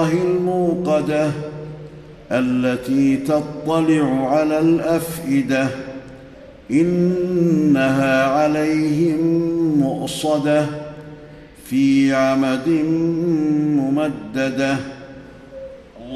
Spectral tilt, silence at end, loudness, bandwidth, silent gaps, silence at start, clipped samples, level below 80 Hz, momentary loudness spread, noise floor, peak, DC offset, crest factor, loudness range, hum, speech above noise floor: -6.5 dB/octave; 0 s; -18 LUFS; 13 kHz; none; 0 s; under 0.1%; -50 dBFS; 18 LU; -40 dBFS; -6 dBFS; under 0.1%; 12 dB; 3 LU; none; 23 dB